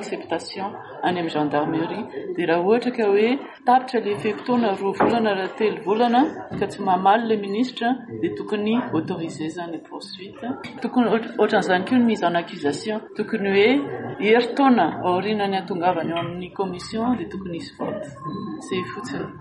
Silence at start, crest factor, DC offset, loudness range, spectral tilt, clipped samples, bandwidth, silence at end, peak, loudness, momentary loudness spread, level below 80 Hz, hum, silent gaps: 0 s; 16 dB; under 0.1%; 6 LU; -6 dB/octave; under 0.1%; 11.5 kHz; 0 s; -6 dBFS; -22 LUFS; 13 LU; -60 dBFS; none; none